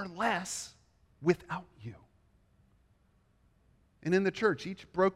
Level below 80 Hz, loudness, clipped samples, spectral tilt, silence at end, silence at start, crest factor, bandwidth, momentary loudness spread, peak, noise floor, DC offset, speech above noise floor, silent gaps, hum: -68 dBFS; -33 LUFS; under 0.1%; -5 dB/octave; 0 s; 0 s; 22 dB; 14.5 kHz; 18 LU; -12 dBFS; -69 dBFS; under 0.1%; 37 dB; none; none